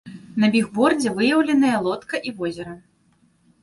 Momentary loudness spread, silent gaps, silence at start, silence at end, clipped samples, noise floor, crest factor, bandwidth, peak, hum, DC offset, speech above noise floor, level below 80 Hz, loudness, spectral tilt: 12 LU; none; 0.05 s; 0.85 s; under 0.1%; -61 dBFS; 18 dB; 11.5 kHz; -4 dBFS; none; under 0.1%; 41 dB; -60 dBFS; -20 LUFS; -5 dB/octave